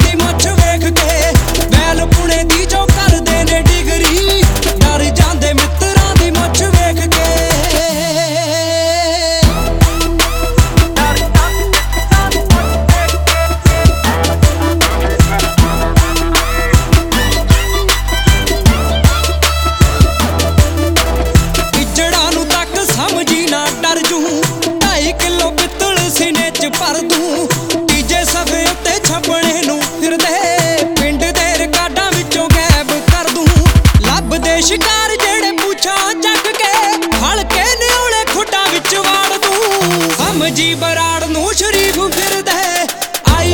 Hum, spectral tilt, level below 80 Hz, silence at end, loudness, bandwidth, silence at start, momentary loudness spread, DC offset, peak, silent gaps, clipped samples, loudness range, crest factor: none; -4 dB/octave; -18 dBFS; 0 s; -11 LUFS; over 20 kHz; 0 s; 3 LU; under 0.1%; 0 dBFS; none; 0.4%; 2 LU; 12 dB